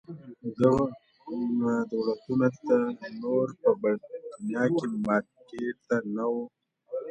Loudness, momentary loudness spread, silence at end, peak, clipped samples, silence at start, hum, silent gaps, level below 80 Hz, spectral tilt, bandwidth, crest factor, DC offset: -28 LUFS; 14 LU; 0 s; -8 dBFS; under 0.1%; 0.1 s; none; none; -62 dBFS; -8 dB/octave; 8.6 kHz; 20 dB; under 0.1%